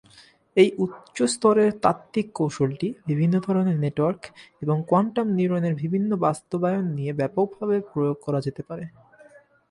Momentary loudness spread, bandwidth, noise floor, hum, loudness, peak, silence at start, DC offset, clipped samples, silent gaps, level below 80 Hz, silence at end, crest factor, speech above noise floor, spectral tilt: 10 LU; 11.5 kHz; -54 dBFS; none; -24 LUFS; -4 dBFS; 0.55 s; under 0.1%; under 0.1%; none; -64 dBFS; 0.8 s; 20 dB; 31 dB; -7 dB/octave